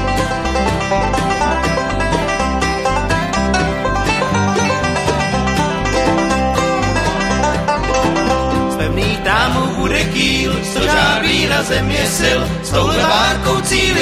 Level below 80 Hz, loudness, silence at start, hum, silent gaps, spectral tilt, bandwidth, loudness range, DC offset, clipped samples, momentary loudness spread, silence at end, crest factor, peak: -26 dBFS; -15 LUFS; 0 s; none; none; -4 dB/octave; 16 kHz; 2 LU; under 0.1%; under 0.1%; 4 LU; 0 s; 16 dB; 0 dBFS